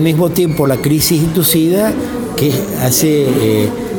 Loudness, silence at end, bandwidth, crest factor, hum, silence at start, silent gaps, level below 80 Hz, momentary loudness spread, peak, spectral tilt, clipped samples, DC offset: -13 LUFS; 0 s; 17.5 kHz; 12 dB; none; 0 s; none; -38 dBFS; 5 LU; 0 dBFS; -5 dB/octave; under 0.1%; under 0.1%